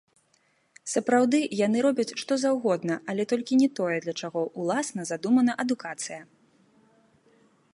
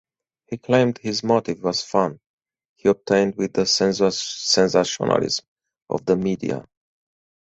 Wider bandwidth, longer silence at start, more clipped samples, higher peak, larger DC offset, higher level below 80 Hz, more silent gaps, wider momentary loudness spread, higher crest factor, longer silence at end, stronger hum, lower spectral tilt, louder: first, 11.5 kHz vs 8.2 kHz; first, 0.85 s vs 0.5 s; neither; second, -10 dBFS vs -4 dBFS; neither; second, -78 dBFS vs -58 dBFS; second, none vs 2.26-2.38 s, 2.65-2.76 s, 5.48-5.56 s, 5.82-5.86 s; about the same, 9 LU vs 9 LU; about the same, 18 dB vs 18 dB; first, 1.5 s vs 0.8 s; neither; about the same, -4.5 dB/octave vs -4 dB/octave; second, -26 LUFS vs -21 LUFS